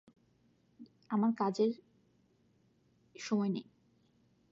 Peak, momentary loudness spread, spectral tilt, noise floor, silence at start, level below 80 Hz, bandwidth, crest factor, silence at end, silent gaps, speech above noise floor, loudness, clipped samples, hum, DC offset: -20 dBFS; 12 LU; -6.5 dB/octave; -71 dBFS; 0.8 s; -84 dBFS; 7.8 kHz; 18 dB; 0.9 s; none; 39 dB; -34 LUFS; under 0.1%; none; under 0.1%